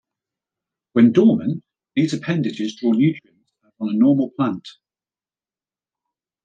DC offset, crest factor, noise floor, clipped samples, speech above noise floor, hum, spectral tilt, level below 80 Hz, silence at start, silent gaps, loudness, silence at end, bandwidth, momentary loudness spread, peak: under 0.1%; 18 dB; under -90 dBFS; under 0.1%; over 72 dB; none; -7.5 dB/octave; -68 dBFS; 0.95 s; none; -19 LUFS; 1.75 s; 7.8 kHz; 13 LU; -4 dBFS